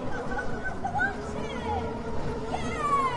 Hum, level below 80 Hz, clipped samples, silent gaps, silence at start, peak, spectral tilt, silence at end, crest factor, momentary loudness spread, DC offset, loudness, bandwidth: none; -42 dBFS; under 0.1%; none; 0 s; -16 dBFS; -5.5 dB/octave; 0 s; 14 dB; 6 LU; under 0.1%; -31 LUFS; 11 kHz